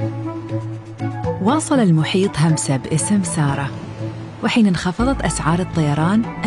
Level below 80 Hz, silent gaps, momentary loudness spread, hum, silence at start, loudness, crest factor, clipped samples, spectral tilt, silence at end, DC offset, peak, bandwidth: -38 dBFS; none; 11 LU; none; 0 s; -19 LUFS; 14 dB; under 0.1%; -5.5 dB/octave; 0 s; under 0.1%; -6 dBFS; 11.5 kHz